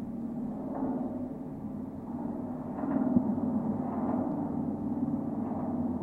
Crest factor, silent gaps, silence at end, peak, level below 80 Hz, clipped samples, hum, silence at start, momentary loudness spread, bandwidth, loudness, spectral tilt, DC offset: 20 dB; none; 0 s; -12 dBFS; -60 dBFS; under 0.1%; none; 0 s; 10 LU; 2.8 kHz; -33 LUFS; -11 dB/octave; under 0.1%